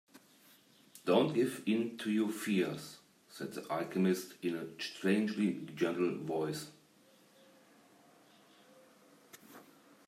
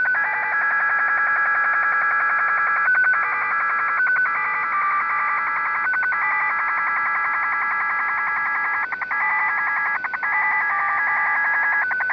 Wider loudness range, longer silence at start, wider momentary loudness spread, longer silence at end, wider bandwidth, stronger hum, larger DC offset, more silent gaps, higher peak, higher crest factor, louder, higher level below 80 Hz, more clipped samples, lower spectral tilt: first, 6 LU vs 2 LU; first, 0.15 s vs 0 s; first, 22 LU vs 3 LU; first, 0.45 s vs 0 s; first, 16 kHz vs 5.4 kHz; neither; neither; neither; second, -16 dBFS vs -10 dBFS; first, 22 dB vs 10 dB; second, -35 LUFS vs -19 LUFS; second, -82 dBFS vs -64 dBFS; neither; first, -5.5 dB/octave vs -4 dB/octave